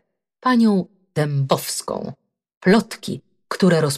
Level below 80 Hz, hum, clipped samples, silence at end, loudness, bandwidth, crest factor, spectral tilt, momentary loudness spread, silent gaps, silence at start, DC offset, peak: -60 dBFS; none; under 0.1%; 0 s; -20 LUFS; 15.5 kHz; 14 dB; -5.5 dB/octave; 14 LU; 2.57-2.61 s; 0.45 s; under 0.1%; -6 dBFS